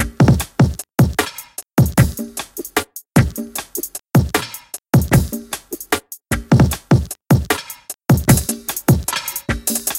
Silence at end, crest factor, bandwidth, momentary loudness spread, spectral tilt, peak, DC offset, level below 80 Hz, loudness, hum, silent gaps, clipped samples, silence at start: 0 s; 18 dB; 17 kHz; 12 LU; -5.5 dB/octave; 0 dBFS; under 0.1%; -30 dBFS; -18 LUFS; none; none; under 0.1%; 0 s